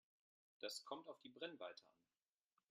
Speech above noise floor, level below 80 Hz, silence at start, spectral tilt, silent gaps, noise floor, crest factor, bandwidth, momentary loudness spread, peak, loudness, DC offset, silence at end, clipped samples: over 35 dB; under -90 dBFS; 0.6 s; -2 dB/octave; none; under -90 dBFS; 22 dB; 12.5 kHz; 7 LU; -34 dBFS; -54 LUFS; under 0.1%; 0.8 s; under 0.1%